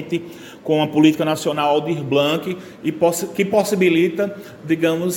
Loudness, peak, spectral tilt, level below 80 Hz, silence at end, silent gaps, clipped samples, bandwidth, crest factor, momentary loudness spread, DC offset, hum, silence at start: -19 LUFS; 0 dBFS; -5 dB/octave; -62 dBFS; 0 s; none; under 0.1%; 17 kHz; 18 dB; 11 LU; under 0.1%; none; 0 s